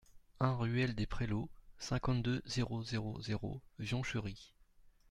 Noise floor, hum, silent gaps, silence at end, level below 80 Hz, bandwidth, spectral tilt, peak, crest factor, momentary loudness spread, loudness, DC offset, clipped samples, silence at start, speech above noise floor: -64 dBFS; none; none; 0.2 s; -52 dBFS; 11 kHz; -6 dB/octave; -20 dBFS; 20 dB; 10 LU; -39 LUFS; under 0.1%; under 0.1%; 0.15 s; 27 dB